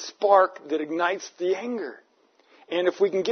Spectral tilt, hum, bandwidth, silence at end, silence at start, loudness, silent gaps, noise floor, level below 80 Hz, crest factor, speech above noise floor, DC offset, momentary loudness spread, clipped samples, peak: -4 dB/octave; none; 6.6 kHz; 0 s; 0 s; -25 LUFS; none; -61 dBFS; -86 dBFS; 20 dB; 37 dB; under 0.1%; 12 LU; under 0.1%; -6 dBFS